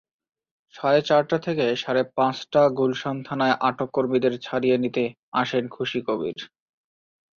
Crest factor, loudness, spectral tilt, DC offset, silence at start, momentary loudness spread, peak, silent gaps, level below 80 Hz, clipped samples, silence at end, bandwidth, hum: 18 dB; -23 LUFS; -6 dB/octave; under 0.1%; 0.75 s; 8 LU; -6 dBFS; 5.19-5.32 s; -66 dBFS; under 0.1%; 0.9 s; 7.2 kHz; none